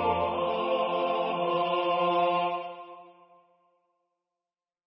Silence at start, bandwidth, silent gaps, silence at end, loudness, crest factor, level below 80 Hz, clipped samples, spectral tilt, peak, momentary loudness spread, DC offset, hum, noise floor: 0 s; 5.6 kHz; none; 1.75 s; -28 LUFS; 16 dB; -60 dBFS; under 0.1%; -9 dB/octave; -14 dBFS; 11 LU; under 0.1%; none; under -90 dBFS